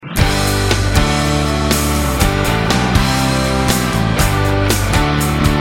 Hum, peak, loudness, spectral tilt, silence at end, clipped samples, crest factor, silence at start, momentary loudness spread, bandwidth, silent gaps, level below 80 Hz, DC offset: none; 0 dBFS; -15 LUFS; -4.5 dB/octave; 0 s; under 0.1%; 14 dB; 0 s; 1 LU; 16.5 kHz; none; -22 dBFS; under 0.1%